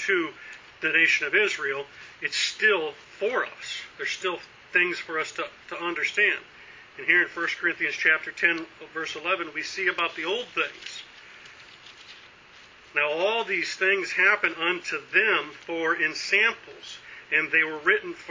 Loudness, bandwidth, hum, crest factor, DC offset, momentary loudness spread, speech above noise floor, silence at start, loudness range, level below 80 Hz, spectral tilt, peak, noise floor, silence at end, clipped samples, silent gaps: -25 LUFS; 7.6 kHz; none; 22 dB; under 0.1%; 17 LU; 25 dB; 0 s; 6 LU; -72 dBFS; -2 dB/octave; -4 dBFS; -51 dBFS; 0 s; under 0.1%; none